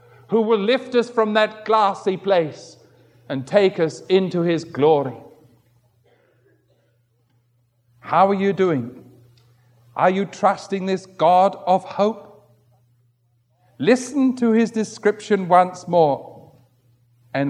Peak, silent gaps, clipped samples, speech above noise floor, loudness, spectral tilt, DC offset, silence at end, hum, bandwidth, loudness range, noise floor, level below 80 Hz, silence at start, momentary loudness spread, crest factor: -2 dBFS; none; under 0.1%; 45 dB; -19 LUFS; -6 dB/octave; under 0.1%; 0 s; none; 11.5 kHz; 5 LU; -64 dBFS; -74 dBFS; 0.3 s; 9 LU; 20 dB